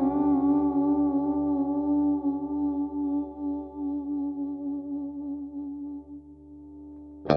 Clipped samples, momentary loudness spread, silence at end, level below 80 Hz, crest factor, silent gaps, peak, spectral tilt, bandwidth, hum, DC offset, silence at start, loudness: under 0.1%; 21 LU; 0 s; -54 dBFS; 22 dB; none; -6 dBFS; -9.5 dB/octave; 5.4 kHz; none; under 0.1%; 0 s; -28 LUFS